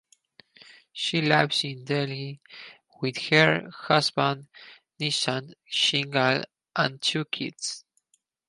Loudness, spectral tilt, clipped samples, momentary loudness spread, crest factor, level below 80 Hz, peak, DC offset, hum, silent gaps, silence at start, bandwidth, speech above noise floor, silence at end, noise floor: -25 LUFS; -4 dB/octave; under 0.1%; 14 LU; 24 dB; -72 dBFS; -4 dBFS; under 0.1%; none; none; 0.95 s; 11.5 kHz; 45 dB; 0.7 s; -71 dBFS